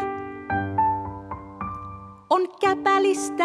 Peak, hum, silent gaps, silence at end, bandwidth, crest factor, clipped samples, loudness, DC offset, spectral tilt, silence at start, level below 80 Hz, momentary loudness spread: -8 dBFS; none; none; 0 s; 13 kHz; 16 dB; under 0.1%; -24 LUFS; under 0.1%; -5 dB/octave; 0 s; -52 dBFS; 17 LU